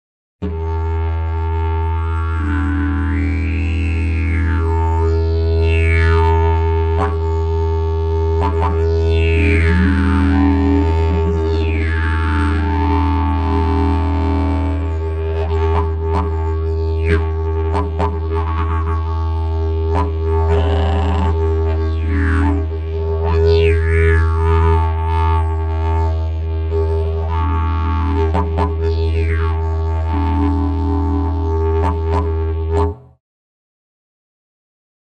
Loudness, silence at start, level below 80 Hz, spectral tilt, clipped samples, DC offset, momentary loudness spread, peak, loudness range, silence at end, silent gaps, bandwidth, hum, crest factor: -17 LUFS; 0.4 s; -20 dBFS; -8.5 dB/octave; under 0.1%; under 0.1%; 6 LU; -2 dBFS; 4 LU; 2.2 s; none; 5.2 kHz; none; 14 dB